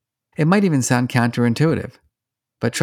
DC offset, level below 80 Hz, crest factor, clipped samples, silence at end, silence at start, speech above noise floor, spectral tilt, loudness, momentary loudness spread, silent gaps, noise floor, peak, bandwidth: under 0.1%; -58 dBFS; 16 dB; under 0.1%; 0 s; 0.4 s; 66 dB; -6 dB/octave; -19 LUFS; 9 LU; none; -84 dBFS; -2 dBFS; 16.5 kHz